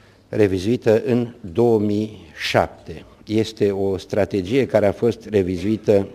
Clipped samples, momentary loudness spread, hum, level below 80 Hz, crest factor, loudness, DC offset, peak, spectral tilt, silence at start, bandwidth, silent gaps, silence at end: under 0.1%; 9 LU; none; -50 dBFS; 18 dB; -20 LUFS; under 0.1%; 0 dBFS; -7 dB/octave; 0.3 s; 15.5 kHz; none; 0 s